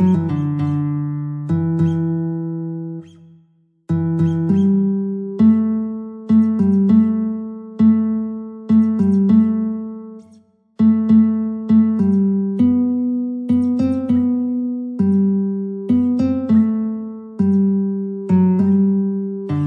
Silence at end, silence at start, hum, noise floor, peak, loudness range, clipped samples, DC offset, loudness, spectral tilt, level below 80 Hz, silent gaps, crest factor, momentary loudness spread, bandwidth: 0 s; 0 s; none; -56 dBFS; -4 dBFS; 4 LU; under 0.1%; under 0.1%; -17 LUFS; -11 dB/octave; -54 dBFS; none; 14 dB; 11 LU; 3.8 kHz